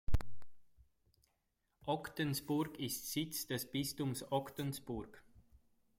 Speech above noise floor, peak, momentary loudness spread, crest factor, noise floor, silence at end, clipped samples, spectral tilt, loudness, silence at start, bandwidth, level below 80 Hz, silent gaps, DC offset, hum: 43 dB; -22 dBFS; 8 LU; 16 dB; -83 dBFS; 0.8 s; under 0.1%; -4.5 dB/octave; -41 LUFS; 0.1 s; 16.5 kHz; -52 dBFS; none; under 0.1%; none